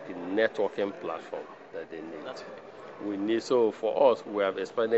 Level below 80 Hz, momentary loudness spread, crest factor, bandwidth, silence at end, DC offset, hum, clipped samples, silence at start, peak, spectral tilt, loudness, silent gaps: -80 dBFS; 18 LU; 20 dB; 8 kHz; 0 s; under 0.1%; none; under 0.1%; 0 s; -10 dBFS; -3.5 dB/octave; -29 LUFS; none